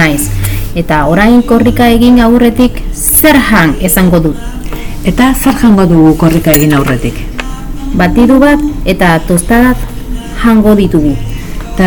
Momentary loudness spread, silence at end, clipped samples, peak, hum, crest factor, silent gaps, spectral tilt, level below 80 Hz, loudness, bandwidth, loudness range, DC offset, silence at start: 15 LU; 0 s; 7%; 0 dBFS; none; 8 dB; none; -5.5 dB/octave; -18 dBFS; -7 LUFS; over 20 kHz; 3 LU; under 0.1%; 0 s